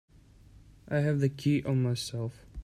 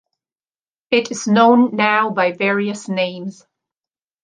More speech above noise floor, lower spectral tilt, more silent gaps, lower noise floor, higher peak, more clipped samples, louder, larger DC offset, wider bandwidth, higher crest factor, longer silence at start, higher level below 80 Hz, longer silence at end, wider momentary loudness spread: second, 27 dB vs over 74 dB; first, -6.5 dB/octave vs -5 dB/octave; neither; second, -56 dBFS vs under -90 dBFS; second, -14 dBFS vs -2 dBFS; neither; second, -30 LUFS vs -16 LUFS; neither; first, 13 kHz vs 9.8 kHz; about the same, 16 dB vs 18 dB; about the same, 0.9 s vs 0.9 s; first, -56 dBFS vs -68 dBFS; second, 0 s vs 0.9 s; about the same, 9 LU vs 10 LU